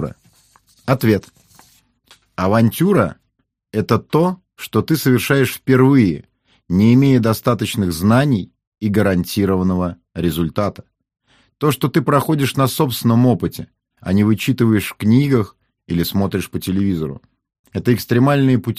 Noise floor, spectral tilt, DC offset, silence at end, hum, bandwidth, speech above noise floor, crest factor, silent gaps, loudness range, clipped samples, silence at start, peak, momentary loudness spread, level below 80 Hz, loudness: -69 dBFS; -6.5 dB/octave; under 0.1%; 0.05 s; none; 15.5 kHz; 53 dB; 16 dB; 8.67-8.72 s, 17.59-17.64 s; 4 LU; under 0.1%; 0 s; 0 dBFS; 11 LU; -46 dBFS; -17 LUFS